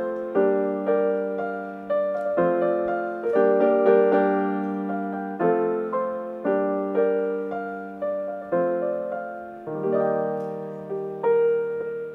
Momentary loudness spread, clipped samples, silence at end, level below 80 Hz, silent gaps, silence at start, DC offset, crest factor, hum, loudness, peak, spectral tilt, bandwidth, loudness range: 12 LU; under 0.1%; 0 s; -68 dBFS; none; 0 s; under 0.1%; 16 dB; none; -24 LUFS; -6 dBFS; -9.5 dB/octave; 4.2 kHz; 5 LU